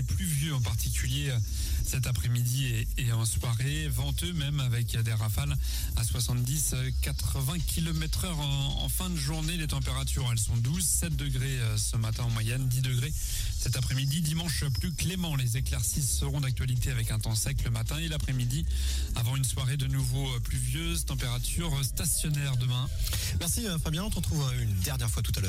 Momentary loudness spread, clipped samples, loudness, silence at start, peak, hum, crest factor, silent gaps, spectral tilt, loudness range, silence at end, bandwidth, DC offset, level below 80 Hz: 3 LU; under 0.1%; -30 LUFS; 0 s; -16 dBFS; none; 14 dB; none; -4 dB/octave; 1 LU; 0 s; 16 kHz; under 0.1%; -34 dBFS